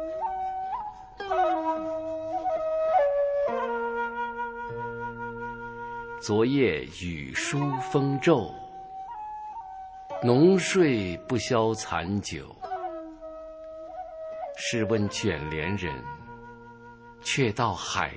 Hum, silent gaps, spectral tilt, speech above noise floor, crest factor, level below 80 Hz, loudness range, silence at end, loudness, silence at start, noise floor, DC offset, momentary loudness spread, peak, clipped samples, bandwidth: none; none; -5.5 dB/octave; 22 dB; 20 dB; -52 dBFS; 6 LU; 0 s; -28 LUFS; 0 s; -48 dBFS; under 0.1%; 18 LU; -8 dBFS; under 0.1%; 8 kHz